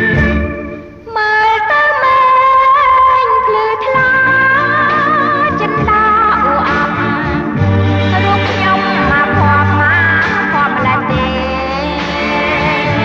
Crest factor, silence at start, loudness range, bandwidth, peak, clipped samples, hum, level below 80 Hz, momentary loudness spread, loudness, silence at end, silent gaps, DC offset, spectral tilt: 10 dB; 0 s; 3 LU; 7.2 kHz; -2 dBFS; under 0.1%; none; -30 dBFS; 8 LU; -11 LUFS; 0 s; none; under 0.1%; -6.5 dB/octave